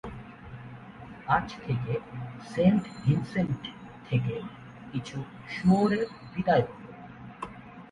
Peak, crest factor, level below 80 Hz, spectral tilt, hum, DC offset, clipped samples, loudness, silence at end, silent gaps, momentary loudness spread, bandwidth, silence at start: -12 dBFS; 18 dB; -56 dBFS; -8 dB/octave; none; under 0.1%; under 0.1%; -29 LUFS; 0.05 s; none; 21 LU; 11 kHz; 0.05 s